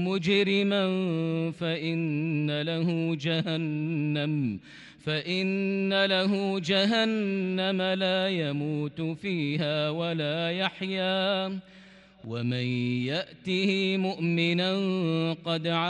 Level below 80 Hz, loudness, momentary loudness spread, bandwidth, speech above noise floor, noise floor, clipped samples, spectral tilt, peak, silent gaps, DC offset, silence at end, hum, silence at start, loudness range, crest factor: -70 dBFS; -27 LUFS; 7 LU; 9.6 kHz; 24 dB; -51 dBFS; under 0.1%; -6.5 dB/octave; -12 dBFS; none; under 0.1%; 0 s; none; 0 s; 3 LU; 16 dB